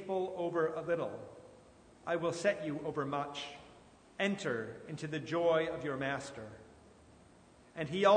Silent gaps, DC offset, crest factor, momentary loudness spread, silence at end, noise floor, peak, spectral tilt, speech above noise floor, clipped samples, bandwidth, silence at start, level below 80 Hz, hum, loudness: none; under 0.1%; 22 dB; 19 LU; 0 s; -61 dBFS; -14 dBFS; -5.5 dB/octave; 27 dB; under 0.1%; 9.6 kHz; 0 s; -70 dBFS; none; -36 LUFS